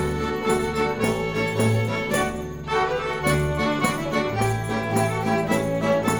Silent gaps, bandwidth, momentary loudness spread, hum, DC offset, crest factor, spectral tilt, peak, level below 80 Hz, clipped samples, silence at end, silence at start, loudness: none; 19 kHz; 3 LU; none; 0.3%; 18 dB; -5.5 dB/octave; -6 dBFS; -40 dBFS; under 0.1%; 0 s; 0 s; -23 LUFS